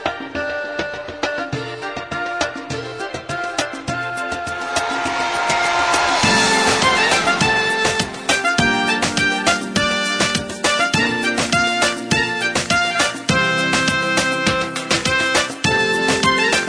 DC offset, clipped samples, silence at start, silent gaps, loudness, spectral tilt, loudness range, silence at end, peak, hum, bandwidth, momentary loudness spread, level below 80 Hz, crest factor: under 0.1%; under 0.1%; 0 s; none; -17 LUFS; -2.5 dB/octave; 9 LU; 0 s; -2 dBFS; none; 11 kHz; 10 LU; -46 dBFS; 18 dB